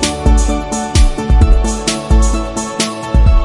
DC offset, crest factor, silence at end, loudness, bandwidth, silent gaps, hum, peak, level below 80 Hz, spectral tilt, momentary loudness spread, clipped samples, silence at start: under 0.1%; 12 dB; 0 s; -14 LUFS; 11.5 kHz; none; none; 0 dBFS; -12 dBFS; -5 dB/octave; 6 LU; under 0.1%; 0 s